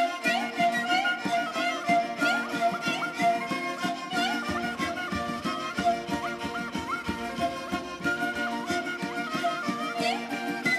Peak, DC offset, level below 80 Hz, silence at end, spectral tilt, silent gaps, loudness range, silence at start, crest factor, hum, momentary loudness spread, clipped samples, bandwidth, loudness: -12 dBFS; under 0.1%; -58 dBFS; 0 s; -4 dB/octave; none; 4 LU; 0 s; 16 dB; none; 6 LU; under 0.1%; 14 kHz; -28 LUFS